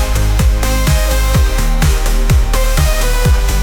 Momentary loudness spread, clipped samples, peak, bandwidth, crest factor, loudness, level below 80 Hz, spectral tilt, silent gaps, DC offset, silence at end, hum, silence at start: 1 LU; under 0.1%; -2 dBFS; 19 kHz; 8 dB; -14 LUFS; -12 dBFS; -4.5 dB/octave; none; under 0.1%; 0 s; none; 0 s